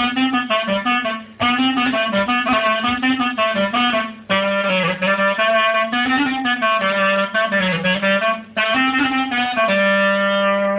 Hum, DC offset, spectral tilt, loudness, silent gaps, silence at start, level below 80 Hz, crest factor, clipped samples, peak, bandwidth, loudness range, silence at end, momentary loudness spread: none; under 0.1%; -8.5 dB/octave; -17 LUFS; none; 0 s; -52 dBFS; 14 dB; under 0.1%; -4 dBFS; 4 kHz; 1 LU; 0 s; 3 LU